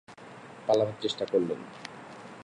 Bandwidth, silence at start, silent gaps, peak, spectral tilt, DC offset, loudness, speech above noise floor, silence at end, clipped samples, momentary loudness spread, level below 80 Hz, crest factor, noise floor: 11.5 kHz; 0.1 s; none; -12 dBFS; -5.5 dB/octave; under 0.1%; -29 LUFS; 19 dB; 0 s; under 0.1%; 20 LU; -74 dBFS; 20 dB; -48 dBFS